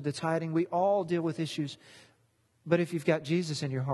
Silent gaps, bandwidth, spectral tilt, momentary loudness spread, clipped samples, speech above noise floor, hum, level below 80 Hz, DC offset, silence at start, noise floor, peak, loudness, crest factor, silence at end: none; 12.5 kHz; -6.5 dB/octave; 9 LU; under 0.1%; 40 dB; none; -74 dBFS; under 0.1%; 0 s; -70 dBFS; -12 dBFS; -30 LUFS; 20 dB; 0 s